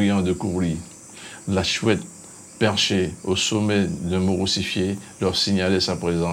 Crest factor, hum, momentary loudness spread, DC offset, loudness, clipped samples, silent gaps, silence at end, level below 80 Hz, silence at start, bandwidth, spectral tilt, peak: 18 dB; none; 15 LU; under 0.1%; -22 LUFS; under 0.1%; none; 0 s; -48 dBFS; 0 s; 15.5 kHz; -4.5 dB/octave; -4 dBFS